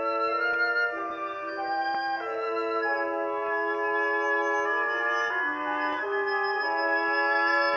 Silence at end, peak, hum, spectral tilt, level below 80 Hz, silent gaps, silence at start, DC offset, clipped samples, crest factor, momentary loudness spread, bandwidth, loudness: 0 s; -14 dBFS; none; -3 dB/octave; -76 dBFS; none; 0 s; under 0.1%; under 0.1%; 14 dB; 6 LU; 7.2 kHz; -27 LUFS